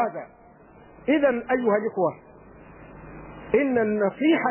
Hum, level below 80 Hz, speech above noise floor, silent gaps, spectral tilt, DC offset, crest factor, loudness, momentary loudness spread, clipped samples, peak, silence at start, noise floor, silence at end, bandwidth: none; -56 dBFS; 28 dB; none; -10 dB/octave; under 0.1%; 18 dB; -23 LUFS; 22 LU; under 0.1%; -8 dBFS; 0 s; -50 dBFS; 0 s; 3.2 kHz